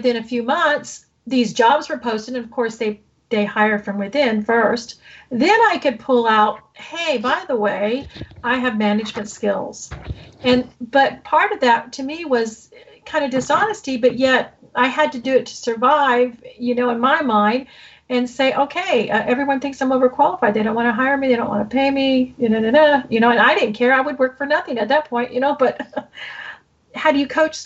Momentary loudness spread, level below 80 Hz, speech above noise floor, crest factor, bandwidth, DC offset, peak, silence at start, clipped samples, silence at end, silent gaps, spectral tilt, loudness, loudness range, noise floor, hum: 12 LU; -52 dBFS; 21 dB; 14 dB; 8.2 kHz; under 0.1%; -4 dBFS; 0 s; under 0.1%; 0 s; none; -4.5 dB/octave; -18 LUFS; 4 LU; -39 dBFS; none